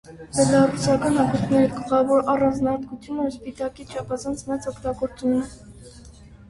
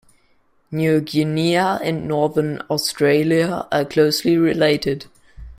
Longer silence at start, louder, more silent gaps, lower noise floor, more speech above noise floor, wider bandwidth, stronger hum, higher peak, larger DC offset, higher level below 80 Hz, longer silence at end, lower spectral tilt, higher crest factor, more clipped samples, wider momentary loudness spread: second, 0.1 s vs 0.7 s; second, -22 LUFS vs -19 LUFS; neither; second, -45 dBFS vs -59 dBFS; second, 23 dB vs 41 dB; second, 11.5 kHz vs 16 kHz; neither; second, -6 dBFS vs -2 dBFS; neither; about the same, -48 dBFS vs -50 dBFS; about the same, 0.15 s vs 0.05 s; about the same, -6 dB/octave vs -5.5 dB/octave; about the same, 18 dB vs 16 dB; neither; first, 12 LU vs 6 LU